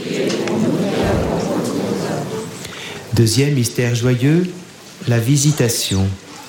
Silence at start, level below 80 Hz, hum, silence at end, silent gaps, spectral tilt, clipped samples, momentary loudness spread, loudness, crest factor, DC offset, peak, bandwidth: 0 s; -40 dBFS; none; 0 s; none; -5 dB/octave; under 0.1%; 13 LU; -18 LUFS; 14 dB; under 0.1%; -4 dBFS; 17.5 kHz